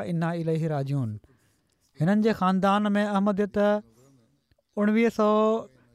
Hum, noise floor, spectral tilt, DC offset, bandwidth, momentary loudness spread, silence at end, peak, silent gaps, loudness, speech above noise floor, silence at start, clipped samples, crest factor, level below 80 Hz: none; -68 dBFS; -7.5 dB/octave; under 0.1%; 12 kHz; 8 LU; 0.25 s; -12 dBFS; none; -25 LUFS; 44 dB; 0 s; under 0.1%; 14 dB; -64 dBFS